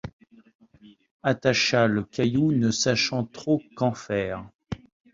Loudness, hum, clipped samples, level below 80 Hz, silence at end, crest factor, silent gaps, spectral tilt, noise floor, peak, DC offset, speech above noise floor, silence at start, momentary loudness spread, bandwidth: -24 LUFS; none; under 0.1%; -54 dBFS; 0.4 s; 20 dB; 0.13-0.19 s, 0.55-0.59 s, 1.11-1.20 s, 4.55-4.59 s; -4.5 dB/octave; -54 dBFS; -6 dBFS; under 0.1%; 30 dB; 0.05 s; 18 LU; 7.8 kHz